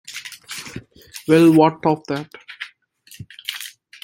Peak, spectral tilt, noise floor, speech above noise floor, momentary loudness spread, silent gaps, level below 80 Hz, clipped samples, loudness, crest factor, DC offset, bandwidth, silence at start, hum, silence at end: -2 dBFS; -6 dB/octave; -49 dBFS; 34 dB; 24 LU; none; -60 dBFS; under 0.1%; -17 LUFS; 20 dB; under 0.1%; 17 kHz; 0.1 s; none; 0.35 s